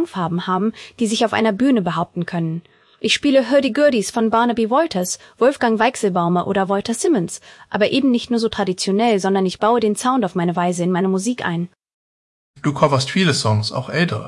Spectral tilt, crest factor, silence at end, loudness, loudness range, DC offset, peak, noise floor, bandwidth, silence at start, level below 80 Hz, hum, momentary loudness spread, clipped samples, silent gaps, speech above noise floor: -5 dB/octave; 16 dB; 0 s; -18 LUFS; 3 LU; under 0.1%; -2 dBFS; under -90 dBFS; 12 kHz; 0 s; -58 dBFS; none; 8 LU; under 0.1%; 11.93-12.54 s; over 72 dB